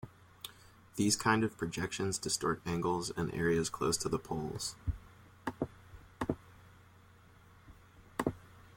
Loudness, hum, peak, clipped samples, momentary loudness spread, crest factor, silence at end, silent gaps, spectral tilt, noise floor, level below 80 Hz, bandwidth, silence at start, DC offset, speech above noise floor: -35 LUFS; none; -14 dBFS; under 0.1%; 16 LU; 24 dB; 0.1 s; none; -4 dB/octave; -60 dBFS; -56 dBFS; 16.5 kHz; 0.05 s; under 0.1%; 26 dB